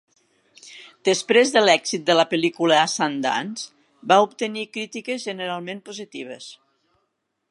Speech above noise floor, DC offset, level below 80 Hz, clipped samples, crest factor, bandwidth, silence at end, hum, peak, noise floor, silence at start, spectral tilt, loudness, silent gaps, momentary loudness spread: 54 dB; under 0.1%; -78 dBFS; under 0.1%; 22 dB; 11.5 kHz; 0.95 s; none; -2 dBFS; -75 dBFS; 0.65 s; -3 dB/octave; -20 LUFS; none; 19 LU